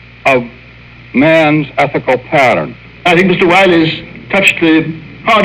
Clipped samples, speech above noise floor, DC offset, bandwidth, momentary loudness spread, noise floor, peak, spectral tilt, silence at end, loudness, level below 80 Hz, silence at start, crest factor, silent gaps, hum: 0.7%; 25 dB; under 0.1%; 14.5 kHz; 10 LU; -35 dBFS; 0 dBFS; -5.5 dB/octave; 0 s; -10 LUFS; -42 dBFS; 0.25 s; 10 dB; none; none